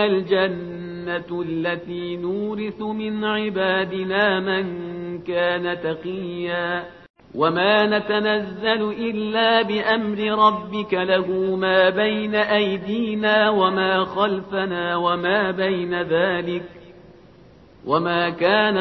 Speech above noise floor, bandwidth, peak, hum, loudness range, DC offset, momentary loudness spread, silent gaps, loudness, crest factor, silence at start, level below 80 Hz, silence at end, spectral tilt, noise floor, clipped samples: 27 dB; 6 kHz; -2 dBFS; none; 5 LU; under 0.1%; 11 LU; 7.10-7.14 s; -21 LUFS; 18 dB; 0 s; -58 dBFS; 0 s; -7.5 dB/octave; -48 dBFS; under 0.1%